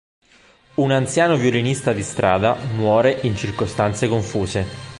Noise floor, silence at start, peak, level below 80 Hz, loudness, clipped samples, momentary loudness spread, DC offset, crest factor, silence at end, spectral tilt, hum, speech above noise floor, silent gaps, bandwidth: -53 dBFS; 0.8 s; -2 dBFS; -44 dBFS; -19 LUFS; under 0.1%; 7 LU; under 0.1%; 18 dB; 0 s; -5.5 dB/octave; none; 34 dB; none; 11.5 kHz